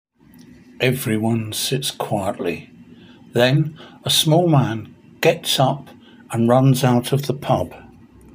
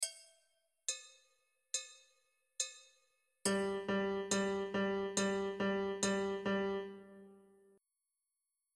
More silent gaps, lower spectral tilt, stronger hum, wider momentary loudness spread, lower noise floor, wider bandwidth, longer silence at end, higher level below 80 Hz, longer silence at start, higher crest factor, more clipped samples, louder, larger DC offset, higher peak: neither; first, -5 dB/octave vs -3.5 dB/octave; neither; second, 12 LU vs 16 LU; second, -47 dBFS vs -89 dBFS; first, 16 kHz vs 13.5 kHz; second, 0.55 s vs 1.4 s; first, -56 dBFS vs -74 dBFS; first, 0.8 s vs 0 s; about the same, 18 dB vs 20 dB; neither; first, -19 LUFS vs -38 LUFS; neither; first, -2 dBFS vs -22 dBFS